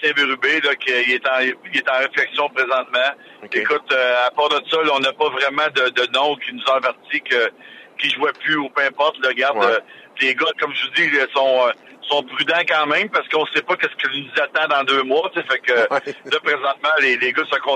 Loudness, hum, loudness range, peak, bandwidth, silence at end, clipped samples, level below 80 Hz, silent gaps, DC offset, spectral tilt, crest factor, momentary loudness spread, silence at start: -18 LUFS; none; 2 LU; -4 dBFS; 10.5 kHz; 0 s; under 0.1%; -78 dBFS; none; under 0.1%; -3 dB/octave; 16 dB; 5 LU; 0 s